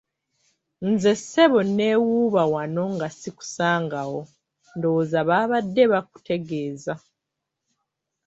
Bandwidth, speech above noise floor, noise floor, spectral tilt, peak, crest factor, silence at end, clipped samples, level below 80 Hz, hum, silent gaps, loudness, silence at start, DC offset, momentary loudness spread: 8.2 kHz; 61 dB; -83 dBFS; -5.5 dB/octave; -4 dBFS; 20 dB; 1.3 s; under 0.1%; -66 dBFS; none; none; -22 LUFS; 0.8 s; under 0.1%; 14 LU